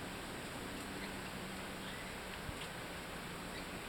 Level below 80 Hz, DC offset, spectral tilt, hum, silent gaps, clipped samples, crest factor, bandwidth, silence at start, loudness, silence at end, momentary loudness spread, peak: -58 dBFS; under 0.1%; -3.5 dB/octave; none; none; under 0.1%; 14 dB; 19 kHz; 0 s; -45 LUFS; 0 s; 1 LU; -32 dBFS